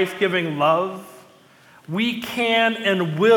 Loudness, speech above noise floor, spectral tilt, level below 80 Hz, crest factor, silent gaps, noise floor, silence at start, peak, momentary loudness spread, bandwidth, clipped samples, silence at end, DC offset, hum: -21 LUFS; 31 dB; -5.5 dB/octave; -68 dBFS; 16 dB; none; -51 dBFS; 0 s; -6 dBFS; 9 LU; 18 kHz; under 0.1%; 0 s; under 0.1%; none